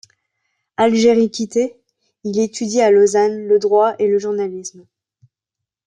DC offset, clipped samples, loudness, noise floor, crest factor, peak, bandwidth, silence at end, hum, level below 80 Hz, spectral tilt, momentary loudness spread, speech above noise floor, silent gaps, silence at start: under 0.1%; under 0.1%; -16 LUFS; -84 dBFS; 14 dB; -2 dBFS; 9.8 kHz; 1.2 s; none; -64 dBFS; -4.5 dB/octave; 13 LU; 68 dB; none; 0.8 s